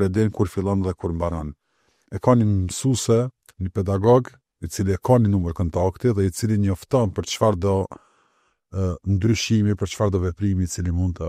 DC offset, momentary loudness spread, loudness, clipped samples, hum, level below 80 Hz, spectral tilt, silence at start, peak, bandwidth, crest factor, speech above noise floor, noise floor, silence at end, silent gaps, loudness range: under 0.1%; 11 LU; -22 LUFS; under 0.1%; none; -42 dBFS; -6.5 dB/octave; 0 s; -4 dBFS; 14.5 kHz; 18 dB; 45 dB; -66 dBFS; 0 s; none; 2 LU